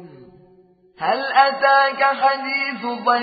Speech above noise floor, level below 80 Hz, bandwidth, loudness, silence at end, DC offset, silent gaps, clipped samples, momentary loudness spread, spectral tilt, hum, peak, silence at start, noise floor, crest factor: 35 dB; -70 dBFS; 5 kHz; -18 LUFS; 0 s; under 0.1%; none; under 0.1%; 8 LU; -8 dB/octave; none; -2 dBFS; 0 s; -53 dBFS; 18 dB